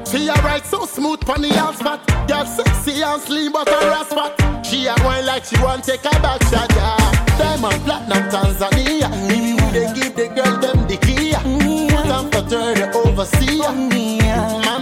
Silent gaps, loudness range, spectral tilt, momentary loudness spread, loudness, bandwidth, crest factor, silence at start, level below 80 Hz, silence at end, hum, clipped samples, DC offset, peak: none; 2 LU; -5 dB/octave; 4 LU; -17 LUFS; 17 kHz; 10 dB; 0 s; -24 dBFS; 0 s; none; under 0.1%; under 0.1%; -6 dBFS